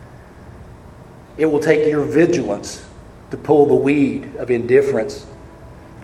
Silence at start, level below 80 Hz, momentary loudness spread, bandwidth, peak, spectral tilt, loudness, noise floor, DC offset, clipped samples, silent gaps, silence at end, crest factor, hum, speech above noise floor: 0 s; -46 dBFS; 18 LU; 12.5 kHz; 0 dBFS; -6.5 dB/octave; -17 LUFS; -40 dBFS; under 0.1%; under 0.1%; none; 0 s; 18 dB; none; 24 dB